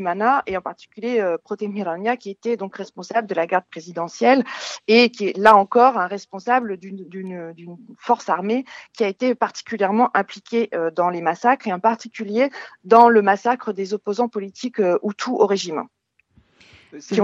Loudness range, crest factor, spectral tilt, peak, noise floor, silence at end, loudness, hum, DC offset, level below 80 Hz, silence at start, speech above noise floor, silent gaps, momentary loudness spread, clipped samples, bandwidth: 7 LU; 20 dB; -5 dB/octave; 0 dBFS; -59 dBFS; 0 s; -20 LUFS; none; under 0.1%; -68 dBFS; 0 s; 39 dB; none; 17 LU; under 0.1%; 8.4 kHz